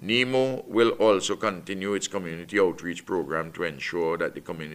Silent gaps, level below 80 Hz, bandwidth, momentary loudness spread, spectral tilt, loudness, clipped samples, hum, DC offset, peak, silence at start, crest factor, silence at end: none; -62 dBFS; 15.5 kHz; 9 LU; -4 dB/octave; -26 LUFS; under 0.1%; none; under 0.1%; -8 dBFS; 0 s; 18 dB; 0 s